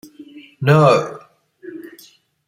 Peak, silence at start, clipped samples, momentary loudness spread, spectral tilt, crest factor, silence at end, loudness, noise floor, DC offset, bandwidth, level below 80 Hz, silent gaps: -2 dBFS; 0.2 s; under 0.1%; 24 LU; -7 dB/octave; 18 dB; 0.6 s; -14 LUFS; -49 dBFS; under 0.1%; 15 kHz; -60 dBFS; none